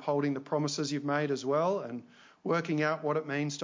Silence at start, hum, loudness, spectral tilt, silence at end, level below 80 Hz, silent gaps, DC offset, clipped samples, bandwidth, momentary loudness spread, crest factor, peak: 0 s; none; -31 LUFS; -5.5 dB/octave; 0 s; -80 dBFS; none; under 0.1%; under 0.1%; 7.6 kHz; 6 LU; 16 dB; -16 dBFS